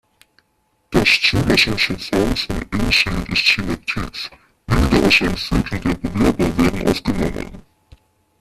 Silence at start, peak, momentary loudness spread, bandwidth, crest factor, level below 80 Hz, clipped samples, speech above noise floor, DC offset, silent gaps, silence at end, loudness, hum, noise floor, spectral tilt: 0.9 s; 0 dBFS; 11 LU; 14.5 kHz; 18 dB; -30 dBFS; under 0.1%; 47 dB; under 0.1%; none; 0.8 s; -17 LUFS; none; -65 dBFS; -4.5 dB/octave